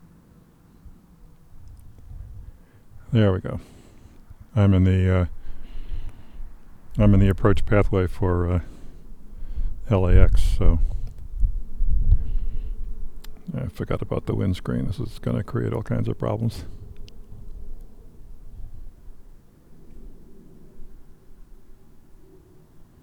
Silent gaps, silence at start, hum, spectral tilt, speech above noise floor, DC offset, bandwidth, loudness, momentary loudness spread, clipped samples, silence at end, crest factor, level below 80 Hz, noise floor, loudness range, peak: none; 0.85 s; none; -8.5 dB/octave; 34 dB; under 0.1%; 9 kHz; -24 LUFS; 26 LU; under 0.1%; 0.2 s; 22 dB; -28 dBFS; -53 dBFS; 7 LU; -2 dBFS